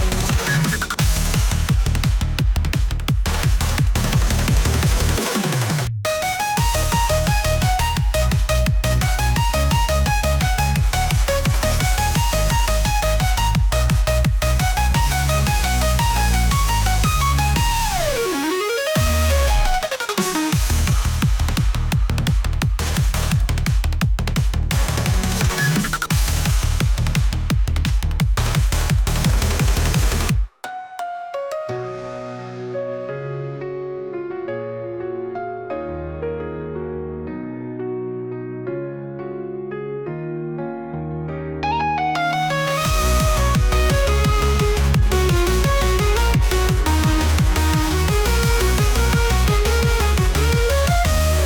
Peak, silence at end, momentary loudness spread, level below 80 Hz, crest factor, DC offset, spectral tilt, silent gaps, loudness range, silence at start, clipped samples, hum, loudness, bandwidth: -6 dBFS; 0 s; 10 LU; -22 dBFS; 12 dB; under 0.1%; -4.5 dB/octave; none; 10 LU; 0 s; under 0.1%; none; -20 LUFS; 19.5 kHz